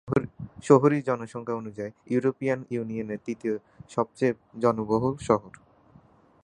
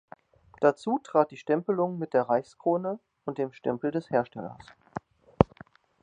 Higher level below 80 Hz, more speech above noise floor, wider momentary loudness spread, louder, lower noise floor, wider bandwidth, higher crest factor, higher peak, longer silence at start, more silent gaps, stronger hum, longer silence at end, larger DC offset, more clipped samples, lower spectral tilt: second, -58 dBFS vs -52 dBFS; first, 31 dB vs 26 dB; about the same, 13 LU vs 15 LU; about the same, -27 LUFS vs -28 LUFS; about the same, -57 dBFS vs -54 dBFS; about the same, 10.5 kHz vs 9.6 kHz; about the same, 24 dB vs 28 dB; second, -4 dBFS vs 0 dBFS; second, 0.05 s vs 0.6 s; neither; neither; first, 0.95 s vs 0.6 s; neither; neither; about the same, -7.5 dB/octave vs -8 dB/octave